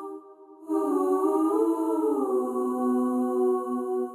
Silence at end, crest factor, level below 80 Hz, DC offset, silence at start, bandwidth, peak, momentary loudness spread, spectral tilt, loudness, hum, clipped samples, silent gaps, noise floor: 0 s; 12 dB; -88 dBFS; under 0.1%; 0 s; 15 kHz; -14 dBFS; 6 LU; -6.5 dB/octave; -26 LUFS; none; under 0.1%; none; -48 dBFS